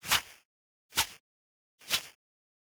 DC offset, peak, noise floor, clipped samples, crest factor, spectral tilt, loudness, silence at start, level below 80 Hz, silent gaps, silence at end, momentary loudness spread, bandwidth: under 0.1%; -12 dBFS; under -90 dBFS; under 0.1%; 26 dB; 0.5 dB/octave; -32 LUFS; 0.05 s; -62 dBFS; 0.45-0.89 s, 1.20-1.78 s; 0.55 s; 22 LU; over 20 kHz